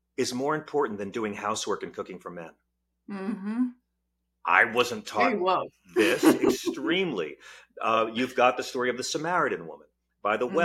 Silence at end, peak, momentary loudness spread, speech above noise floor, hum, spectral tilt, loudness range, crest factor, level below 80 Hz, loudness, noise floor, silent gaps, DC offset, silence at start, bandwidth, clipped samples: 0 s; -4 dBFS; 16 LU; 52 dB; none; -4 dB/octave; 8 LU; 24 dB; -68 dBFS; -27 LUFS; -79 dBFS; none; under 0.1%; 0.2 s; 16.5 kHz; under 0.1%